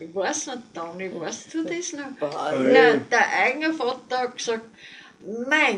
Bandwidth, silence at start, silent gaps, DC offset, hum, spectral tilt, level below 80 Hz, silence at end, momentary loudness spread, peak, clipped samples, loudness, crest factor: 10.5 kHz; 0 s; none; under 0.1%; none; -3 dB/octave; -74 dBFS; 0 s; 18 LU; -4 dBFS; under 0.1%; -23 LUFS; 20 dB